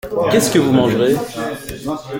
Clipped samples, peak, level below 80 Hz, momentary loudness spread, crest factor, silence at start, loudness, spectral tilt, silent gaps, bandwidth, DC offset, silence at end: under 0.1%; 0 dBFS; -44 dBFS; 12 LU; 16 dB; 0.05 s; -16 LUFS; -5 dB/octave; none; 17 kHz; under 0.1%; 0 s